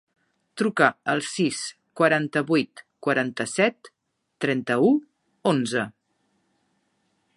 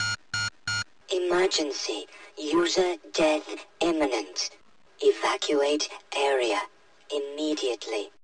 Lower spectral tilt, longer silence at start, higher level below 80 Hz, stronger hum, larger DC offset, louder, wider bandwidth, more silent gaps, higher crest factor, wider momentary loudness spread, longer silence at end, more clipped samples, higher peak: first, -5 dB/octave vs -2.5 dB/octave; first, 0.55 s vs 0 s; second, -74 dBFS vs -62 dBFS; neither; second, under 0.1% vs 0.1%; first, -24 LUFS vs -27 LUFS; about the same, 11.5 kHz vs 11 kHz; neither; first, 24 dB vs 16 dB; about the same, 10 LU vs 9 LU; first, 1.45 s vs 0.15 s; neither; first, -2 dBFS vs -12 dBFS